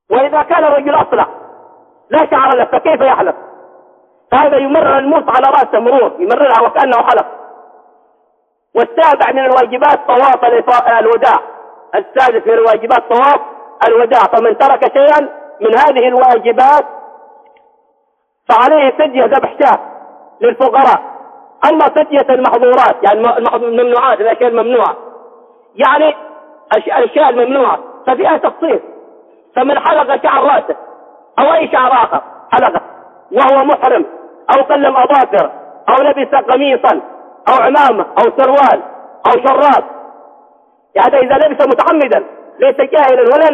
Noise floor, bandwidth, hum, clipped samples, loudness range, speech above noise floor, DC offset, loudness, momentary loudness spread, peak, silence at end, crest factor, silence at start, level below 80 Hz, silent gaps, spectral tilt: -61 dBFS; 7.4 kHz; none; under 0.1%; 3 LU; 52 dB; under 0.1%; -10 LUFS; 8 LU; 0 dBFS; 0 s; 10 dB; 0.1 s; -58 dBFS; none; -5.5 dB/octave